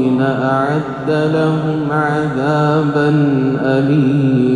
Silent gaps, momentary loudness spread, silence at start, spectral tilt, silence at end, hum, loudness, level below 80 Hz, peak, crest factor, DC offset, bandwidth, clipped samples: none; 4 LU; 0 s; -8.5 dB/octave; 0 s; none; -15 LUFS; -50 dBFS; -2 dBFS; 12 dB; under 0.1%; 10 kHz; under 0.1%